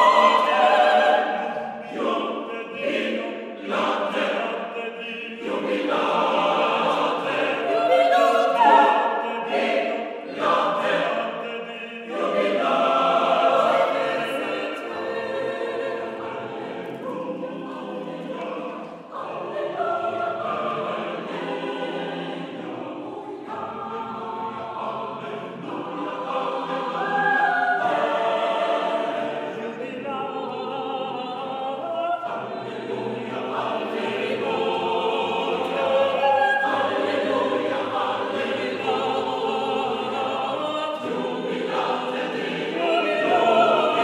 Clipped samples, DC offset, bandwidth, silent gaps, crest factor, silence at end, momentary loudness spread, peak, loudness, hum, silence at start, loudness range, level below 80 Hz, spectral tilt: under 0.1%; under 0.1%; 13 kHz; none; 18 dB; 0 s; 13 LU; -4 dBFS; -24 LUFS; none; 0 s; 11 LU; -76 dBFS; -4.5 dB/octave